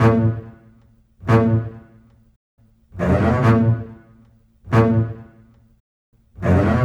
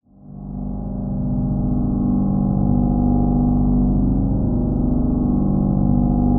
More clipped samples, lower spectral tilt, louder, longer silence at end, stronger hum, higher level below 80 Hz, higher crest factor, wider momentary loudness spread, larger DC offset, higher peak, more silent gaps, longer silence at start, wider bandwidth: neither; second, -9 dB/octave vs -13.5 dB/octave; about the same, -18 LUFS vs -19 LUFS; about the same, 0 s vs 0 s; second, none vs 50 Hz at -30 dBFS; second, -40 dBFS vs -24 dBFS; first, 18 dB vs 12 dB; first, 16 LU vs 9 LU; neither; first, -2 dBFS vs -6 dBFS; first, 2.36-2.58 s, 5.80-6.13 s vs none; second, 0 s vs 0.25 s; first, 7.2 kHz vs 1.6 kHz